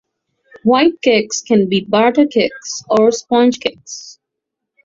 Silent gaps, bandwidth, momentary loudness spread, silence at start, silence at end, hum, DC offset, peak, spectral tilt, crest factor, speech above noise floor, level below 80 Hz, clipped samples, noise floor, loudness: none; 7.8 kHz; 12 LU; 0.65 s; 0.7 s; none; under 0.1%; 0 dBFS; -4 dB/octave; 14 dB; 65 dB; -58 dBFS; under 0.1%; -79 dBFS; -14 LUFS